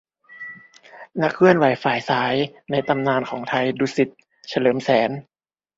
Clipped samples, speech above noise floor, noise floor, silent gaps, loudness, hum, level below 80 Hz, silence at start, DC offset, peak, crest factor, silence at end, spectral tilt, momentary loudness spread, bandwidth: under 0.1%; 25 dB; -45 dBFS; none; -20 LUFS; none; -62 dBFS; 0.3 s; under 0.1%; 0 dBFS; 22 dB; 0.55 s; -6 dB/octave; 19 LU; 7.8 kHz